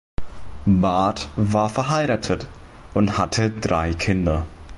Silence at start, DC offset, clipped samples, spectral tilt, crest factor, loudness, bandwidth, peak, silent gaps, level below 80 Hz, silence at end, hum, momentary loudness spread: 0.2 s; under 0.1%; under 0.1%; -6 dB/octave; 14 dB; -21 LUFS; 11.5 kHz; -8 dBFS; none; -36 dBFS; 0 s; none; 8 LU